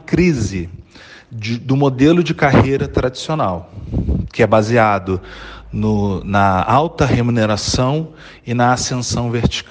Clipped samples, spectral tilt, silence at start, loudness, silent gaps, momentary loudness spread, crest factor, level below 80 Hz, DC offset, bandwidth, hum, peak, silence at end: under 0.1%; -6 dB/octave; 0.1 s; -16 LUFS; none; 14 LU; 16 dB; -32 dBFS; under 0.1%; 9.8 kHz; none; 0 dBFS; 0.05 s